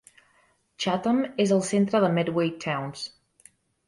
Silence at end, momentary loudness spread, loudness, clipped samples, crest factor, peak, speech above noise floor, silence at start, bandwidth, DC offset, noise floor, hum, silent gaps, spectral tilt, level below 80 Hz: 0.8 s; 11 LU; -25 LUFS; under 0.1%; 18 dB; -8 dBFS; 41 dB; 0.8 s; 11.5 kHz; under 0.1%; -65 dBFS; none; none; -5.5 dB/octave; -68 dBFS